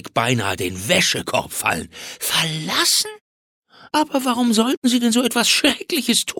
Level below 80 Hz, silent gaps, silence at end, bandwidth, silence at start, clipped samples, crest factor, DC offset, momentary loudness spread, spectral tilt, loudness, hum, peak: -56 dBFS; 3.21-3.63 s, 4.77-4.82 s; 0 s; 18 kHz; 0.05 s; under 0.1%; 16 dB; under 0.1%; 8 LU; -2.5 dB/octave; -18 LUFS; none; -4 dBFS